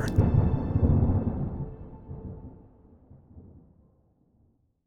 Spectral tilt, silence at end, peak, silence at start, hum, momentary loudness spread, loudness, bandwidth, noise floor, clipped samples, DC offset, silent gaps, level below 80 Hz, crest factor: -9.5 dB/octave; 1.45 s; -10 dBFS; 0 s; none; 21 LU; -26 LUFS; 9.8 kHz; -67 dBFS; under 0.1%; under 0.1%; none; -38 dBFS; 20 dB